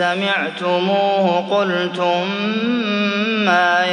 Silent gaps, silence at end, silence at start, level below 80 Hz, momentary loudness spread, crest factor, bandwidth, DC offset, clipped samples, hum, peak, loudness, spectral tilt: none; 0 s; 0 s; -72 dBFS; 5 LU; 16 dB; 9.8 kHz; under 0.1%; under 0.1%; none; -2 dBFS; -17 LUFS; -5.5 dB/octave